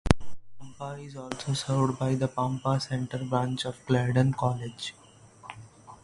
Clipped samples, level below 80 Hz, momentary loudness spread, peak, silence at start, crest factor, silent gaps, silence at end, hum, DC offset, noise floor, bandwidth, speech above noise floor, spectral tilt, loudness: under 0.1%; -46 dBFS; 19 LU; 0 dBFS; 0.05 s; 28 dB; none; 0.1 s; none; under 0.1%; -49 dBFS; 11.5 kHz; 21 dB; -6 dB/octave; -29 LUFS